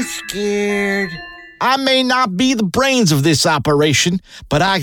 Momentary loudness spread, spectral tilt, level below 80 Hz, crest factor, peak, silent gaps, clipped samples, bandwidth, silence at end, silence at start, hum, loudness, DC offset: 9 LU; -4 dB/octave; -44 dBFS; 12 dB; -2 dBFS; none; under 0.1%; 19 kHz; 0 s; 0 s; none; -15 LUFS; under 0.1%